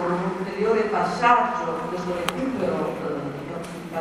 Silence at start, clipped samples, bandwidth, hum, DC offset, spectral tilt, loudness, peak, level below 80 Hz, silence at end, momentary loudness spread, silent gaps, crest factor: 0 s; under 0.1%; 16 kHz; none; under 0.1%; -5.5 dB/octave; -24 LUFS; -2 dBFS; -54 dBFS; 0 s; 13 LU; none; 22 dB